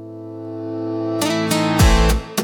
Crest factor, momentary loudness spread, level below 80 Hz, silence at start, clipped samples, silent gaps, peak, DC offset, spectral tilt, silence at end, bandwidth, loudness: 14 dB; 17 LU; -22 dBFS; 0 s; under 0.1%; none; -4 dBFS; under 0.1%; -5 dB/octave; 0 s; over 20 kHz; -18 LUFS